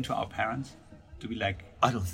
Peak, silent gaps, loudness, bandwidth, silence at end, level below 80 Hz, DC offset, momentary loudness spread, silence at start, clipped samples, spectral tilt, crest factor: -8 dBFS; none; -32 LUFS; 16 kHz; 0 s; -52 dBFS; under 0.1%; 16 LU; 0 s; under 0.1%; -5 dB/octave; 24 dB